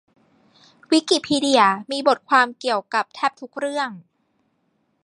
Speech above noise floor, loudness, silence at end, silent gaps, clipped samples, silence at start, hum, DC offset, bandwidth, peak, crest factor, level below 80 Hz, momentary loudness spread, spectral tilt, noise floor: 48 dB; -20 LUFS; 1.05 s; none; under 0.1%; 0.9 s; none; under 0.1%; 11.5 kHz; -2 dBFS; 20 dB; -68 dBFS; 10 LU; -3 dB/octave; -68 dBFS